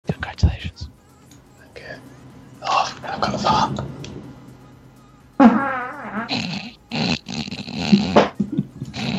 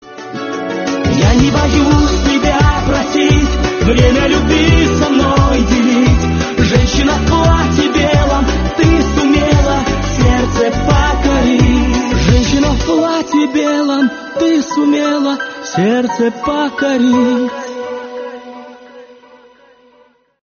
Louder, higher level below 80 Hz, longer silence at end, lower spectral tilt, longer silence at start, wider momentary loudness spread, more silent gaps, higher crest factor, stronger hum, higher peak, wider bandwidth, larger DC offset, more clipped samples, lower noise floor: second, -21 LUFS vs -12 LUFS; second, -38 dBFS vs -20 dBFS; second, 0 s vs 1.4 s; about the same, -6 dB/octave vs -5.5 dB/octave; about the same, 0.05 s vs 0.05 s; first, 22 LU vs 8 LU; neither; first, 22 dB vs 12 dB; neither; about the same, 0 dBFS vs 0 dBFS; first, 8.4 kHz vs 7 kHz; neither; neither; about the same, -48 dBFS vs -50 dBFS